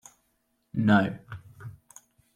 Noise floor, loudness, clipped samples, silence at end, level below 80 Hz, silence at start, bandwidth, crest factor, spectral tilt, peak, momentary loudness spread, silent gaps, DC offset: -73 dBFS; -25 LUFS; under 0.1%; 0.65 s; -62 dBFS; 0.75 s; 11 kHz; 22 dB; -7 dB/octave; -8 dBFS; 23 LU; none; under 0.1%